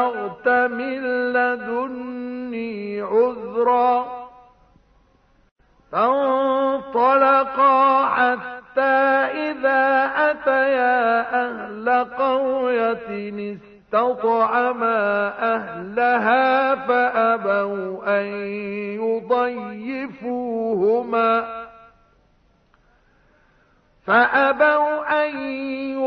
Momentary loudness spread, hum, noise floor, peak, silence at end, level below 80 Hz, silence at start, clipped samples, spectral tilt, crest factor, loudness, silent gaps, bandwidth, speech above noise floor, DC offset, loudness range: 12 LU; none; -59 dBFS; -4 dBFS; 0 s; -62 dBFS; 0 s; under 0.1%; -7.5 dB/octave; 16 dB; -20 LUFS; 5.51-5.56 s; 5.6 kHz; 40 dB; under 0.1%; 6 LU